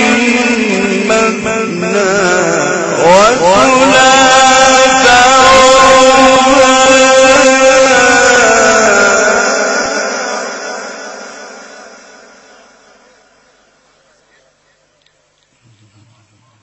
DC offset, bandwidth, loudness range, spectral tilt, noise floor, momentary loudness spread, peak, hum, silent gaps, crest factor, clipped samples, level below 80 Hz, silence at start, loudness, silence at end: under 0.1%; 11 kHz; 13 LU; -2 dB/octave; -55 dBFS; 12 LU; 0 dBFS; none; none; 10 dB; 0.9%; -40 dBFS; 0 s; -7 LUFS; 4.8 s